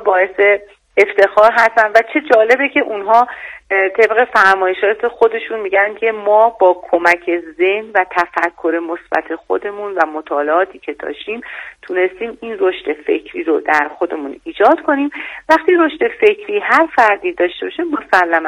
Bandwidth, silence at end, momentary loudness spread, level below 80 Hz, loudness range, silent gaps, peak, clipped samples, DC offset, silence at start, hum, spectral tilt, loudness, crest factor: 12.5 kHz; 0 s; 11 LU; -56 dBFS; 7 LU; none; 0 dBFS; 0.3%; under 0.1%; 0 s; none; -4 dB/octave; -14 LUFS; 14 dB